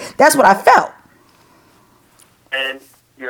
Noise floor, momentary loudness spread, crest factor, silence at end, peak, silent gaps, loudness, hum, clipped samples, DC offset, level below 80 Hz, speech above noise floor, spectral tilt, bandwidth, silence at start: -52 dBFS; 17 LU; 16 dB; 0 s; 0 dBFS; none; -13 LUFS; none; under 0.1%; under 0.1%; -58 dBFS; 40 dB; -2.5 dB/octave; over 20 kHz; 0 s